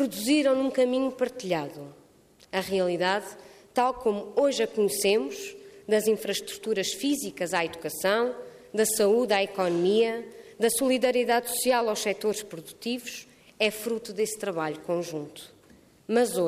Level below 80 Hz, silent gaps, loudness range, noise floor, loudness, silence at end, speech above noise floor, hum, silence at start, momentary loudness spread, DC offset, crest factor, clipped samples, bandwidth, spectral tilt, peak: -66 dBFS; none; 5 LU; -58 dBFS; -27 LUFS; 0 s; 31 dB; none; 0 s; 14 LU; under 0.1%; 16 dB; under 0.1%; 15.5 kHz; -3.5 dB/octave; -10 dBFS